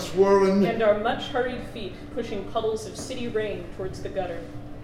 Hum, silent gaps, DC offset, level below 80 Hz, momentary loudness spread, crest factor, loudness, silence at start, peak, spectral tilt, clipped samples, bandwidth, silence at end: none; none; under 0.1%; -44 dBFS; 15 LU; 16 dB; -26 LUFS; 0 s; -8 dBFS; -6 dB/octave; under 0.1%; 13.5 kHz; 0 s